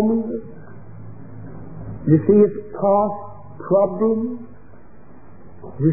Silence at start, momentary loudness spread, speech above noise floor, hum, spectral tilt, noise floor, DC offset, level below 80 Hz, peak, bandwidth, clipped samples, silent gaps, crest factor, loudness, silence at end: 0 s; 25 LU; 29 dB; none; -16.5 dB/octave; -46 dBFS; 1%; -52 dBFS; -4 dBFS; 2.6 kHz; under 0.1%; none; 18 dB; -19 LUFS; 0 s